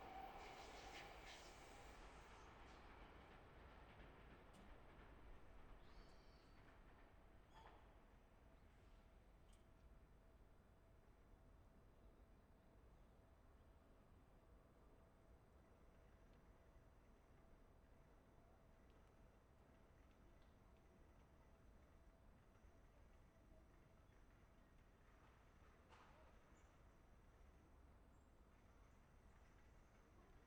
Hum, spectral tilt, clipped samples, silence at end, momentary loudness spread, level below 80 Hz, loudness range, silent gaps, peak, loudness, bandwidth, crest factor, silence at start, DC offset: none; -4.5 dB/octave; under 0.1%; 0 s; 11 LU; -70 dBFS; 8 LU; none; -46 dBFS; -64 LUFS; 19 kHz; 20 dB; 0 s; under 0.1%